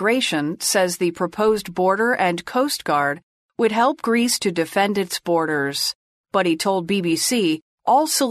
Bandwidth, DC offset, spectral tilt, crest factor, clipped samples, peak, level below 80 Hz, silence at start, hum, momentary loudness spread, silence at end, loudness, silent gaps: 14 kHz; under 0.1%; -3.5 dB/octave; 16 dB; under 0.1%; -4 dBFS; -60 dBFS; 0 s; none; 5 LU; 0 s; -20 LUFS; 3.23-3.49 s, 5.95-6.24 s, 7.62-7.78 s